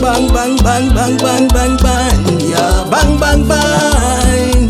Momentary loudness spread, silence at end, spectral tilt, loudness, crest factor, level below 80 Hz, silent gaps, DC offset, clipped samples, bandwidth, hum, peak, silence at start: 2 LU; 0 s; -4.5 dB/octave; -11 LUFS; 10 dB; -14 dBFS; none; under 0.1%; under 0.1%; 15.5 kHz; none; 0 dBFS; 0 s